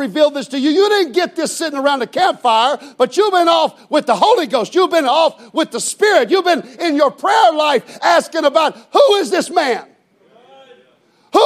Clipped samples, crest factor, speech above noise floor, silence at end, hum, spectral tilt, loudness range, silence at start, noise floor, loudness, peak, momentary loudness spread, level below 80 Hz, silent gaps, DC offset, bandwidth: under 0.1%; 14 dB; 40 dB; 0 s; none; -2.5 dB/octave; 2 LU; 0 s; -54 dBFS; -14 LUFS; 0 dBFS; 6 LU; -74 dBFS; none; under 0.1%; 15 kHz